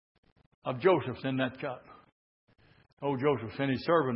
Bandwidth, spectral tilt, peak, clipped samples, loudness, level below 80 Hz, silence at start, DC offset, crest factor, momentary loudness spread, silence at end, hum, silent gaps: 5.8 kHz; -10.5 dB/octave; -12 dBFS; under 0.1%; -31 LUFS; -68 dBFS; 0.65 s; under 0.1%; 20 dB; 13 LU; 0 s; none; 2.12-2.48 s, 2.93-2.97 s